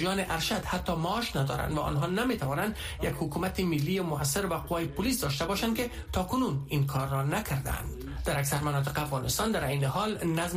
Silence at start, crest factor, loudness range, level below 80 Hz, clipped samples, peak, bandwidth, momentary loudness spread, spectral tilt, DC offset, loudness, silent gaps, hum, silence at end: 0 s; 14 dB; 1 LU; -44 dBFS; under 0.1%; -16 dBFS; 15.5 kHz; 4 LU; -5 dB/octave; under 0.1%; -30 LUFS; none; none; 0 s